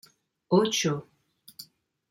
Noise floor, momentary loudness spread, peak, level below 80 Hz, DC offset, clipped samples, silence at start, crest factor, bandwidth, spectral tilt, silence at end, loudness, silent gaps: -59 dBFS; 23 LU; -10 dBFS; -72 dBFS; under 0.1%; under 0.1%; 0.5 s; 20 dB; 16.5 kHz; -4.5 dB/octave; 0.45 s; -26 LUFS; none